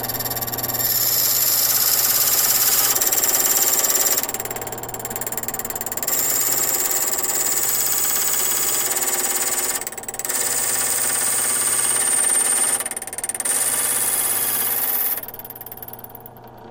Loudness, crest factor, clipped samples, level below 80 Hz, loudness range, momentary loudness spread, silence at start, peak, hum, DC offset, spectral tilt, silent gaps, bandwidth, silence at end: -17 LUFS; 20 dB; under 0.1%; -54 dBFS; 5 LU; 11 LU; 0 s; 0 dBFS; none; under 0.1%; 0 dB/octave; none; 18 kHz; 0 s